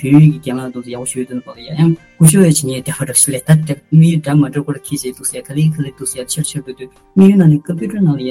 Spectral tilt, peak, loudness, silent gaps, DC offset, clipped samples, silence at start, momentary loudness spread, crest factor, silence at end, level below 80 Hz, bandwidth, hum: -6 dB/octave; 0 dBFS; -13 LUFS; none; under 0.1%; 0.3%; 0 s; 14 LU; 12 dB; 0 s; -50 dBFS; 16 kHz; none